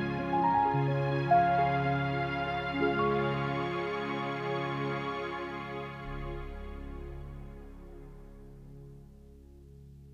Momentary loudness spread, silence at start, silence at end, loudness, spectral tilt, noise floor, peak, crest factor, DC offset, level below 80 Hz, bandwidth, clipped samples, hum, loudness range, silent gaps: 24 LU; 0 s; 0 s; -31 LUFS; -8 dB/octave; -53 dBFS; -14 dBFS; 18 dB; under 0.1%; -48 dBFS; 7 kHz; under 0.1%; none; 18 LU; none